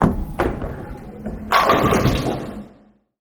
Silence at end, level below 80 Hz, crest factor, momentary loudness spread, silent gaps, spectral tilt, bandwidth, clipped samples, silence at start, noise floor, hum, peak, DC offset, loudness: 0.55 s; -32 dBFS; 20 dB; 18 LU; none; -6 dB/octave; over 20 kHz; under 0.1%; 0 s; -52 dBFS; none; 0 dBFS; under 0.1%; -19 LUFS